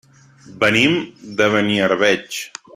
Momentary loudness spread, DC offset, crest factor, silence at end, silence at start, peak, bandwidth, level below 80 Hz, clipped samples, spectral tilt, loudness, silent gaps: 13 LU; under 0.1%; 18 dB; 0.3 s; 0.5 s; -2 dBFS; 16 kHz; -58 dBFS; under 0.1%; -4 dB/octave; -17 LUFS; none